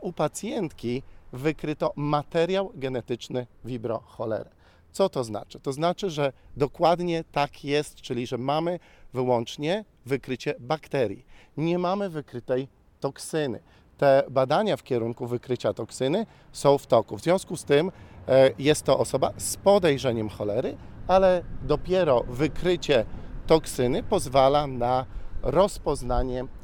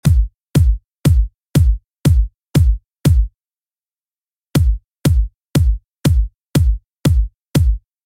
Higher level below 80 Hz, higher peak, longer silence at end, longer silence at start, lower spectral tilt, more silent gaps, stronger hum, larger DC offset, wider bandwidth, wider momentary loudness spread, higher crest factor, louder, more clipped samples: second, -42 dBFS vs -18 dBFS; second, -6 dBFS vs 0 dBFS; second, 0.05 s vs 0.3 s; about the same, 0 s vs 0.05 s; second, -5.5 dB/octave vs -7 dB/octave; second, none vs 4.36-4.41 s, 4.85-4.89 s, 6.41-6.45 s, 6.99-7.03 s; neither; neither; first, 18.5 kHz vs 16 kHz; first, 13 LU vs 4 LU; first, 20 dB vs 14 dB; second, -26 LUFS vs -17 LUFS; neither